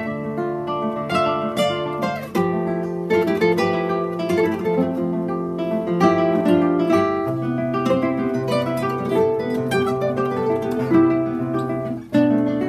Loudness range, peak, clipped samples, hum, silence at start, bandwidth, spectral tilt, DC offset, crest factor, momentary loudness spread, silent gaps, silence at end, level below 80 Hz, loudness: 2 LU; -2 dBFS; under 0.1%; none; 0 s; 14 kHz; -7 dB/octave; under 0.1%; 18 dB; 7 LU; none; 0 s; -54 dBFS; -21 LUFS